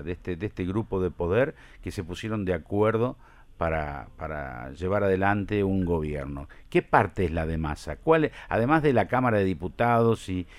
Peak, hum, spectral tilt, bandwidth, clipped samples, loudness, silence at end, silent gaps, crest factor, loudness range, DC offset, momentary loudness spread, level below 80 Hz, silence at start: -4 dBFS; none; -7.5 dB/octave; 13.5 kHz; under 0.1%; -26 LUFS; 0 s; none; 22 dB; 4 LU; under 0.1%; 12 LU; -44 dBFS; 0 s